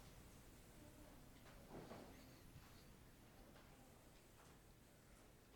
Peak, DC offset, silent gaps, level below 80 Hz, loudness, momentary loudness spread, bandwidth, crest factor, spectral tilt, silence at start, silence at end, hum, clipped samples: -44 dBFS; under 0.1%; none; -70 dBFS; -64 LUFS; 8 LU; 19 kHz; 20 dB; -4.5 dB/octave; 0 s; 0 s; none; under 0.1%